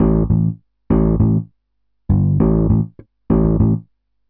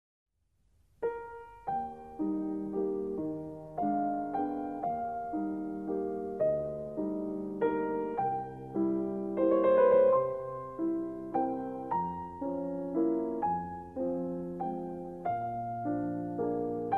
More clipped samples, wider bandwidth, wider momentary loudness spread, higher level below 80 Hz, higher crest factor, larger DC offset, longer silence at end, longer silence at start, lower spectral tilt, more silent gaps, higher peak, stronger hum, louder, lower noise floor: neither; second, 2.5 kHz vs 4 kHz; about the same, 9 LU vs 9 LU; first, -26 dBFS vs -64 dBFS; about the same, 14 dB vs 18 dB; neither; first, 0.5 s vs 0 s; second, 0 s vs 1 s; first, -15 dB/octave vs -10 dB/octave; neither; first, -2 dBFS vs -14 dBFS; neither; first, -17 LUFS vs -33 LUFS; about the same, -71 dBFS vs -72 dBFS